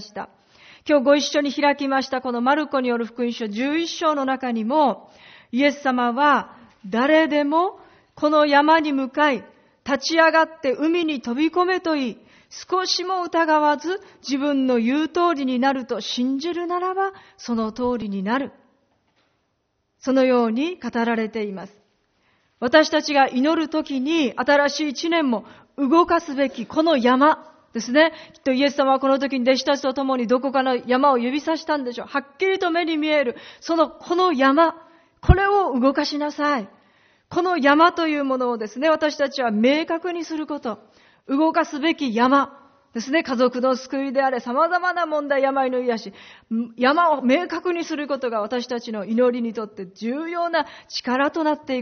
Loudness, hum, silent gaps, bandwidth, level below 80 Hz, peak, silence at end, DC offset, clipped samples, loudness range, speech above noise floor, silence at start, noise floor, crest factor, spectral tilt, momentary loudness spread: -21 LUFS; none; none; 6.6 kHz; -42 dBFS; 0 dBFS; 0 s; under 0.1%; under 0.1%; 5 LU; 51 dB; 0 s; -72 dBFS; 22 dB; -3 dB/octave; 11 LU